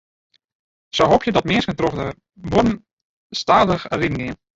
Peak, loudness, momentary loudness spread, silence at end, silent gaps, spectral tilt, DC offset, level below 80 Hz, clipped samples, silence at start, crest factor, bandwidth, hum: 0 dBFS; -19 LUFS; 13 LU; 0.25 s; 2.93-3.30 s; -5.5 dB/octave; under 0.1%; -42 dBFS; under 0.1%; 0.95 s; 20 dB; 8 kHz; none